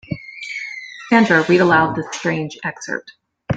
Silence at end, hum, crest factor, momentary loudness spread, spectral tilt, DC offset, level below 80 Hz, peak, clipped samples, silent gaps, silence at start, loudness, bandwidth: 0 s; none; 18 dB; 16 LU; -5.5 dB/octave; under 0.1%; -52 dBFS; -2 dBFS; under 0.1%; none; 0.1 s; -17 LUFS; 9 kHz